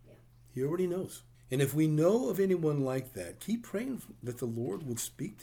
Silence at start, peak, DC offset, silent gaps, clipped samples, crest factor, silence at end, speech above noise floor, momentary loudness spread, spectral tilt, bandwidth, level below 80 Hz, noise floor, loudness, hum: 0.05 s; -16 dBFS; under 0.1%; none; under 0.1%; 16 dB; 0 s; 26 dB; 14 LU; -6.5 dB/octave; over 20 kHz; -64 dBFS; -58 dBFS; -33 LUFS; none